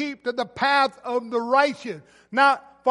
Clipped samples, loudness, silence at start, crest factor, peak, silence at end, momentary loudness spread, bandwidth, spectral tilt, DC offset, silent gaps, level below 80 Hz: under 0.1%; -22 LUFS; 0 s; 18 dB; -6 dBFS; 0 s; 12 LU; 11.5 kHz; -4 dB/octave; under 0.1%; none; -70 dBFS